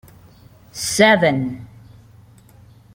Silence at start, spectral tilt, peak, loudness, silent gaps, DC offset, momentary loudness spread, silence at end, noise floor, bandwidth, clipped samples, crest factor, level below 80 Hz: 0.75 s; -4 dB/octave; -2 dBFS; -16 LUFS; none; under 0.1%; 22 LU; 1.3 s; -47 dBFS; 17 kHz; under 0.1%; 20 dB; -54 dBFS